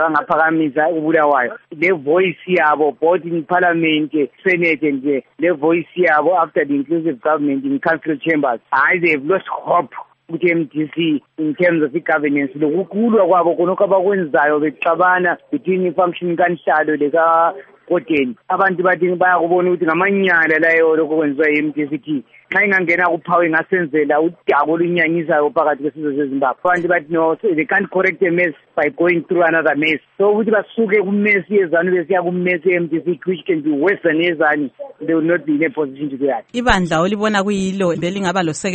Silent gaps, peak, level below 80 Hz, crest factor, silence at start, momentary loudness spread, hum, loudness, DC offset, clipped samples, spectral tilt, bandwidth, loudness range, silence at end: none; 0 dBFS; -48 dBFS; 16 dB; 0 s; 6 LU; none; -16 LUFS; under 0.1%; under 0.1%; -6 dB/octave; 8.4 kHz; 3 LU; 0 s